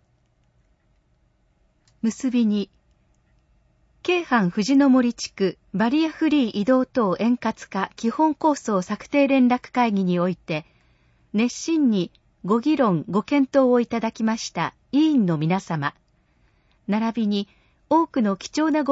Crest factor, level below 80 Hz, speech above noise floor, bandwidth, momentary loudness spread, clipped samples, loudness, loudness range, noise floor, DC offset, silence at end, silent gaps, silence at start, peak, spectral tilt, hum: 16 dB; -62 dBFS; 43 dB; 8 kHz; 9 LU; under 0.1%; -22 LUFS; 5 LU; -64 dBFS; under 0.1%; 0 s; none; 2.05 s; -6 dBFS; -6 dB/octave; none